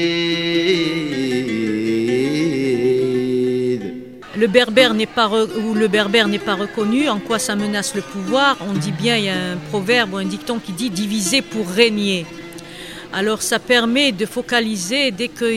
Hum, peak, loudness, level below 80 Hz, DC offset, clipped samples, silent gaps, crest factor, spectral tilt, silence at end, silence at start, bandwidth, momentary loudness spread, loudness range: none; 0 dBFS; -18 LUFS; -56 dBFS; 0.2%; under 0.1%; none; 18 dB; -4 dB/octave; 0 s; 0 s; 16 kHz; 9 LU; 3 LU